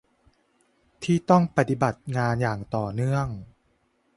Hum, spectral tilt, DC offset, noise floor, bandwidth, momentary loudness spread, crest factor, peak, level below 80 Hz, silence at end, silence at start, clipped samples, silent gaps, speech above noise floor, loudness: none; -7.5 dB/octave; under 0.1%; -68 dBFS; 11.5 kHz; 11 LU; 22 dB; -4 dBFS; -52 dBFS; 0.7 s; 1 s; under 0.1%; none; 44 dB; -25 LUFS